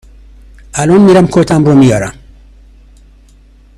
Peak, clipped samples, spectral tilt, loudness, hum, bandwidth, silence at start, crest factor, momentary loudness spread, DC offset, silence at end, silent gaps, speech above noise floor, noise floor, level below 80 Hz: 0 dBFS; 0.4%; -7 dB/octave; -8 LUFS; 50 Hz at -30 dBFS; 12.5 kHz; 0.75 s; 10 dB; 13 LU; under 0.1%; 1.65 s; none; 34 dB; -41 dBFS; -36 dBFS